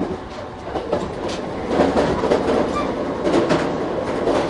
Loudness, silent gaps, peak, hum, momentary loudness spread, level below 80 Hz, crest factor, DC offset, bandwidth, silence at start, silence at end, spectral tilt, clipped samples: -21 LUFS; none; -2 dBFS; none; 10 LU; -40 dBFS; 18 dB; under 0.1%; 11.5 kHz; 0 s; 0 s; -6 dB/octave; under 0.1%